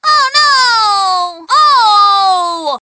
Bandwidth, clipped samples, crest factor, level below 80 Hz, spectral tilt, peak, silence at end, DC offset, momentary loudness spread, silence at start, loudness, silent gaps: 8 kHz; under 0.1%; 10 dB; -58 dBFS; 1 dB/octave; 0 dBFS; 0.05 s; under 0.1%; 7 LU; 0.05 s; -9 LUFS; none